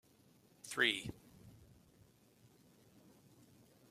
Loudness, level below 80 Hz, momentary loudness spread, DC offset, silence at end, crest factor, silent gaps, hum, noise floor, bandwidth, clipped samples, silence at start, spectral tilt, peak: -37 LUFS; -74 dBFS; 28 LU; under 0.1%; 2.25 s; 28 dB; none; none; -69 dBFS; 16 kHz; under 0.1%; 0.65 s; -2.5 dB/octave; -18 dBFS